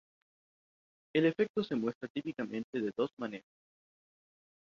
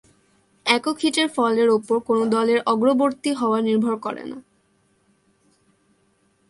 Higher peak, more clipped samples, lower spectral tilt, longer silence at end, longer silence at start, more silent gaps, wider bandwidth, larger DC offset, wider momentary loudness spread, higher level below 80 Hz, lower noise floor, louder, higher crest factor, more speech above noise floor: second, -16 dBFS vs -2 dBFS; neither; first, -7.5 dB/octave vs -4 dB/octave; second, 1.3 s vs 2.1 s; first, 1.15 s vs 0.65 s; first, 1.49-1.54 s, 1.95-2.01 s, 2.10-2.15 s, 2.64-2.73 s, 3.13-3.17 s vs none; second, 7.2 kHz vs 11.5 kHz; neither; about the same, 11 LU vs 9 LU; second, -78 dBFS vs -68 dBFS; first, under -90 dBFS vs -64 dBFS; second, -35 LUFS vs -20 LUFS; about the same, 20 dB vs 20 dB; first, over 56 dB vs 44 dB